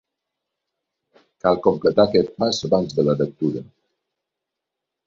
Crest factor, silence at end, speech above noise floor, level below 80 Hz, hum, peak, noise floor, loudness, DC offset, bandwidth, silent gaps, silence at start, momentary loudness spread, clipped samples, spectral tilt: 20 dB; 1.45 s; 64 dB; -56 dBFS; none; -2 dBFS; -83 dBFS; -20 LUFS; under 0.1%; 7.6 kHz; none; 1.45 s; 8 LU; under 0.1%; -6 dB/octave